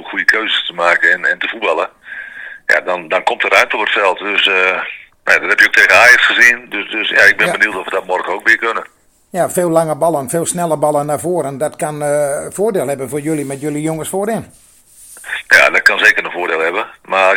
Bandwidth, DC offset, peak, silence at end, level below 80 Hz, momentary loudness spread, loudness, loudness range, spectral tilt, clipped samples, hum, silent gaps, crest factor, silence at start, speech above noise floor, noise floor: over 20 kHz; under 0.1%; 0 dBFS; 0 s; -56 dBFS; 13 LU; -12 LUFS; 9 LU; -3 dB/octave; 0.7%; none; none; 14 dB; 0 s; 28 dB; -41 dBFS